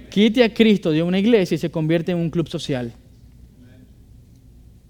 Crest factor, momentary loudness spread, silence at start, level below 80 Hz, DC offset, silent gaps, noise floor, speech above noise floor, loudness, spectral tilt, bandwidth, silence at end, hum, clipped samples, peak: 20 dB; 10 LU; 0 s; -50 dBFS; under 0.1%; none; -47 dBFS; 29 dB; -19 LUFS; -6.5 dB/octave; 15.5 kHz; 2 s; none; under 0.1%; -2 dBFS